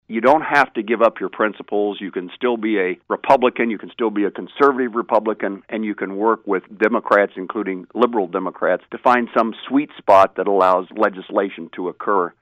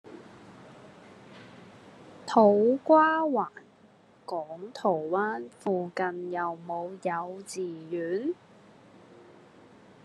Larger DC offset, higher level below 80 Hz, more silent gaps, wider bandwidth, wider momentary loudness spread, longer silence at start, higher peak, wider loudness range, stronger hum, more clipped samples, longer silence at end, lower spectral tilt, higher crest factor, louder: neither; first, -64 dBFS vs -80 dBFS; neither; second, 10.5 kHz vs 12 kHz; second, 10 LU vs 22 LU; about the same, 0.1 s vs 0.05 s; first, -2 dBFS vs -8 dBFS; second, 3 LU vs 9 LU; neither; neither; second, 0.1 s vs 1.7 s; about the same, -6.5 dB/octave vs -6 dB/octave; about the same, 18 dB vs 22 dB; first, -19 LUFS vs -28 LUFS